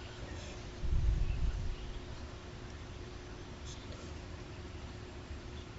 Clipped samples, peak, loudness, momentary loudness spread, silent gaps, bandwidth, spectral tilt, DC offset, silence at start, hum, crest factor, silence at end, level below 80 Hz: under 0.1%; -20 dBFS; -43 LUFS; 11 LU; none; 8 kHz; -5.5 dB/octave; under 0.1%; 0 s; none; 20 dB; 0 s; -40 dBFS